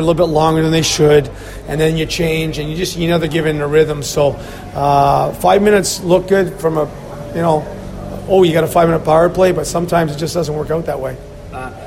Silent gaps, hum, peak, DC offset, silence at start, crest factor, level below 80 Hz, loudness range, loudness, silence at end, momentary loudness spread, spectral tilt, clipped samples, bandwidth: none; none; 0 dBFS; under 0.1%; 0 s; 14 dB; -34 dBFS; 2 LU; -14 LUFS; 0 s; 15 LU; -5 dB/octave; under 0.1%; 16.5 kHz